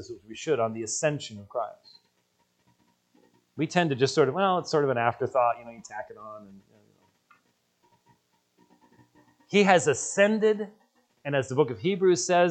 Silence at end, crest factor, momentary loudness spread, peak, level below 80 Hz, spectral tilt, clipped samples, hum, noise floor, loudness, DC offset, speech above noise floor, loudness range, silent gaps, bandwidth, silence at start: 0 s; 24 dB; 18 LU; -4 dBFS; -74 dBFS; -4.5 dB/octave; under 0.1%; none; -71 dBFS; -26 LUFS; under 0.1%; 46 dB; 9 LU; none; 9.2 kHz; 0 s